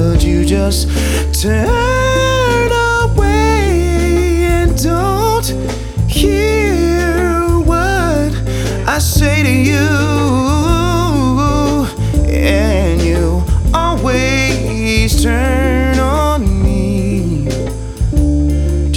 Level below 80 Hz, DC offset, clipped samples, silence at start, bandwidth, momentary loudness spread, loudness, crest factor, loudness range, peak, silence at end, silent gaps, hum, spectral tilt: -16 dBFS; under 0.1%; under 0.1%; 0 s; 17 kHz; 4 LU; -13 LUFS; 12 dB; 1 LU; 0 dBFS; 0 s; none; none; -5.5 dB/octave